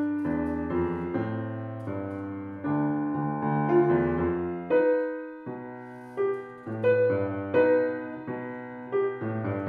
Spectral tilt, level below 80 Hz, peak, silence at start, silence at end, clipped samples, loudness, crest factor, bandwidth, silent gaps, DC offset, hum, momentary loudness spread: -10.5 dB/octave; -56 dBFS; -12 dBFS; 0 s; 0 s; under 0.1%; -28 LUFS; 16 dB; 4.3 kHz; none; under 0.1%; none; 14 LU